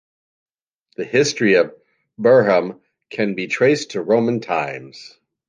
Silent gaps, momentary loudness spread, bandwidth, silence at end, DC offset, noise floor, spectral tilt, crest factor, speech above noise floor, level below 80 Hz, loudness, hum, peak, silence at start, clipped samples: none; 17 LU; 9.8 kHz; 0.45 s; under 0.1%; -67 dBFS; -5 dB/octave; 16 dB; 50 dB; -66 dBFS; -18 LUFS; none; -2 dBFS; 1 s; under 0.1%